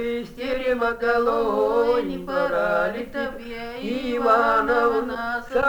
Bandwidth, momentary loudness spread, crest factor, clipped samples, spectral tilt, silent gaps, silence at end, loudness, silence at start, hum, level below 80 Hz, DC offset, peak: over 20 kHz; 10 LU; 16 dB; under 0.1%; -5.5 dB/octave; none; 0 s; -22 LUFS; 0 s; none; -46 dBFS; under 0.1%; -6 dBFS